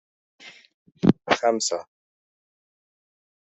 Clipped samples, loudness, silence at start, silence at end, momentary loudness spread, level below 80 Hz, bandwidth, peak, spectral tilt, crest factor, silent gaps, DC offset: under 0.1%; -23 LUFS; 0.45 s; 1.6 s; 6 LU; -60 dBFS; 8.2 kHz; -2 dBFS; -4.5 dB/octave; 26 dB; 0.74-0.86 s; under 0.1%